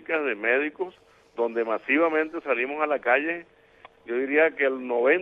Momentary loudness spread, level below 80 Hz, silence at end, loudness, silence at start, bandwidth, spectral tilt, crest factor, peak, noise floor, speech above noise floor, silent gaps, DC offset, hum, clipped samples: 10 LU; -72 dBFS; 0 s; -25 LUFS; 0.1 s; 5.2 kHz; -6.5 dB/octave; 18 dB; -8 dBFS; -53 dBFS; 29 dB; none; under 0.1%; none; under 0.1%